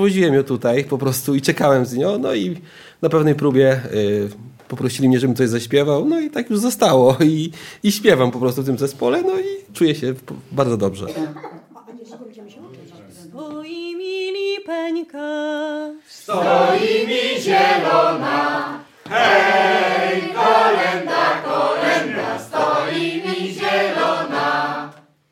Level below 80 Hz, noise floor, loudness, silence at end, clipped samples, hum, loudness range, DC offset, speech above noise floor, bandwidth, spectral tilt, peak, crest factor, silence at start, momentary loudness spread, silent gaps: -62 dBFS; -41 dBFS; -18 LUFS; 0.4 s; under 0.1%; none; 10 LU; under 0.1%; 24 dB; 16.5 kHz; -5 dB/octave; -2 dBFS; 18 dB; 0 s; 14 LU; none